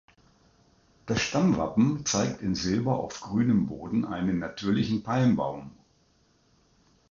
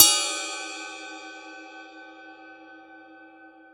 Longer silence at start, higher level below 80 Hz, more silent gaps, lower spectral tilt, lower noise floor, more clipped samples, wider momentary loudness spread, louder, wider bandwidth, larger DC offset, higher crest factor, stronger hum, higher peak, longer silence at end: first, 1.05 s vs 0 s; first, -54 dBFS vs -68 dBFS; neither; first, -5.5 dB/octave vs 2 dB/octave; first, -65 dBFS vs -50 dBFS; neither; second, 7 LU vs 22 LU; about the same, -27 LUFS vs -25 LUFS; second, 7.6 kHz vs over 20 kHz; neither; second, 16 dB vs 28 dB; second, none vs 50 Hz at -105 dBFS; second, -12 dBFS vs 0 dBFS; first, 1.4 s vs 0.75 s